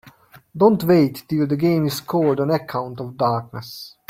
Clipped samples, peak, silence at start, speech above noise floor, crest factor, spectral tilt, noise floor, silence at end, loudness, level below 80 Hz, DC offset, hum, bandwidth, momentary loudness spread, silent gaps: under 0.1%; -4 dBFS; 0.05 s; 29 dB; 16 dB; -7 dB/octave; -49 dBFS; 0.2 s; -19 LUFS; -58 dBFS; under 0.1%; none; 16.5 kHz; 16 LU; none